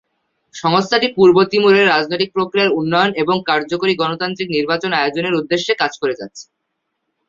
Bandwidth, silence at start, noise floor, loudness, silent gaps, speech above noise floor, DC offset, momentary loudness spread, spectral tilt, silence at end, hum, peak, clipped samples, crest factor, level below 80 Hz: 7.6 kHz; 0.55 s; -73 dBFS; -16 LUFS; none; 58 dB; under 0.1%; 8 LU; -5 dB/octave; 0.85 s; none; -2 dBFS; under 0.1%; 16 dB; -58 dBFS